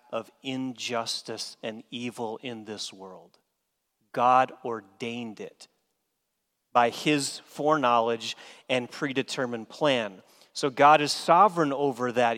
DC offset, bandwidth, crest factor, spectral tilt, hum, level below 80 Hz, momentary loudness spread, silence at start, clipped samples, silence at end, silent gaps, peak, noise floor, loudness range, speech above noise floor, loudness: under 0.1%; 16 kHz; 22 dB; -4 dB/octave; none; -80 dBFS; 17 LU; 0.1 s; under 0.1%; 0 s; none; -6 dBFS; -80 dBFS; 10 LU; 53 dB; -26 LUFS